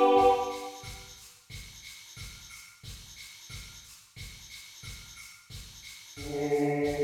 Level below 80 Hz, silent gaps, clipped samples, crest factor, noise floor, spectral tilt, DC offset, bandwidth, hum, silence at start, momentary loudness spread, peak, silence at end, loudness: -54 dBFS; none; under 0.1%; 20 dB; -51 dBFS; -4.5 dB/octave; under 0.1%; 18 kHz; none; 0 s; 18 LU; -12 dBFS; 0 s; -32 LUFS